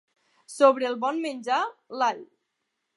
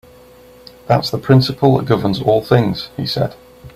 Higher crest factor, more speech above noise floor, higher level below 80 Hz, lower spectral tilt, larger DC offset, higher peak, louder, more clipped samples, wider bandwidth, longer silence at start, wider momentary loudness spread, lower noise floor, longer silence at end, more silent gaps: first, 22 dB vs 16 dB; first, 55 dB vs 28 dB; second, -88 dBFS vs -46 dBFS; second, -3 dB/octave vs -7.5 dB/octave; neither; second, -4 dBFS vs 0 dBFS; second, -25 LUFS vs -16 LUFS; neither; second, 11.5 kHz vs 15.5 kHz; second, 0.5 s vs 0.85 s; first, 13 LU vs 8 LU; first, -80 dBFS vs -43 dBFS; first, 0.7 s vs 0.05 s; neither